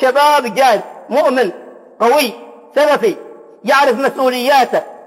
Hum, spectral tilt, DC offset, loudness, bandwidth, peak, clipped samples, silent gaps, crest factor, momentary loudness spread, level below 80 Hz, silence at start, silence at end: none; -3 dB/octave; under 0.1%; -13 LUFS; 16 kHz; -2 dBFS; under 0.1%; none; 12 dB; 8 LU; -68 dBFS; 0 s; 0.1 s